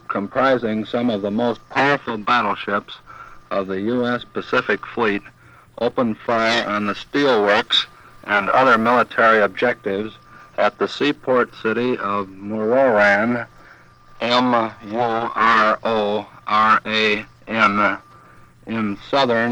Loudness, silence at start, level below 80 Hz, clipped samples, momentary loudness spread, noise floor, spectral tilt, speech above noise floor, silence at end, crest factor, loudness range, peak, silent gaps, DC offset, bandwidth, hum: -19 LUFS; 0.1 s; -56 dBFS; under 0.1%; 11 LU; -47 dBFS; -5 dB/octave; 28 dB; 0 s; 18 dB; 5 LU; -2 dBFS; none; under 0.1%; 11.5 kHz; none